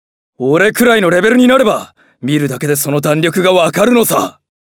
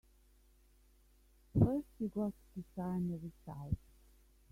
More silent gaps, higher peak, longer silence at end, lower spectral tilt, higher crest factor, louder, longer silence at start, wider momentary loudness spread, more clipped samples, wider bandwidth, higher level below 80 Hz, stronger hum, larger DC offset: neither; first, 0 dBFS vs -16 dBFS; second, 0.4 s vs 0.75 s; second, -4.5 dB/octave vs -10.5 dB/octave; second, 12 dB vs 26 dB; first, -11 LUFS vs -39 LUFS; second, 0.4 s vs 1.55 s; second, 8 LU vs 16 LU; neither; first, over 20 kHz vs 15.5 kHz; about the same, -52 dBFS vs -56 dBFS; neither; neither